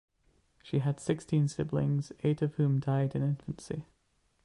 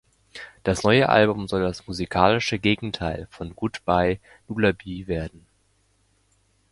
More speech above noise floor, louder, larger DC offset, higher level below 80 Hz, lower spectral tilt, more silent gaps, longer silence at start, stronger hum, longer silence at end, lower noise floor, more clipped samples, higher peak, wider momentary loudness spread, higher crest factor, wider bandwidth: about the same, 43 dB vs 42 dB; second, -32 LUFS vs -23 LUFS; neither; second, -60 dBFS vs -44 dBFS; first, -8 dB/octave vs -5.5 dB/octave; neither; first, 0.65 s vs 0.35 s; neither; second, 0.6 s vs 1.45 s; first, -73 dBFS vs -65 dBFS; neither; second, -16 dBFS vs 0 dBFS; second, 9 LU vs 15 LU; second, 16 dB vs 24 dB; about the same, 11 kHz vs 11.5 kHz